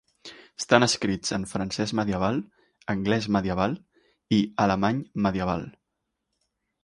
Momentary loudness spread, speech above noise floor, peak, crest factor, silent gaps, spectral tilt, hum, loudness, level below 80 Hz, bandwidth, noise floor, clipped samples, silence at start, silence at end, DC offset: 16 LU; 56 dB; -4 dBFS; 24 dB; none; -5 dB/octave; none; -26 LUFS; -52 dBFS; 11.5 kHz; -81 dBFS; under 0.1%; 0.25 s; 1.15 s; under 0.1%